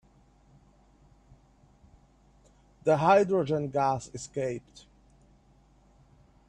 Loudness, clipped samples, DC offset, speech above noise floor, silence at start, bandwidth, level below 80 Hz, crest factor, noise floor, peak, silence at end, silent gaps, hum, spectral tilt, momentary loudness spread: -27 LUFS; under 0.1%; under 0.1%; 35 dB; 2.85 s; 10 kHz; -62 dBFS; 22 dB; -61 dBFS; -10 dBFS; 1.9 s; none; none; -6.5 dB/octave; 13 LU